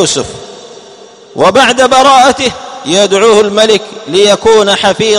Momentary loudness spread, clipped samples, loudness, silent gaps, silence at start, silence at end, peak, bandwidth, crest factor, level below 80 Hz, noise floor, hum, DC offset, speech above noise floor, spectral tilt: 15 LU; 2%; -7 LUFS; none; 0 s; 0 s; 0 dBFS; 13.5 kHz; 8 dB; -42 dBFS; -34 dBFS; none; under 0.1%; 27 dB; -2.5 dB/octave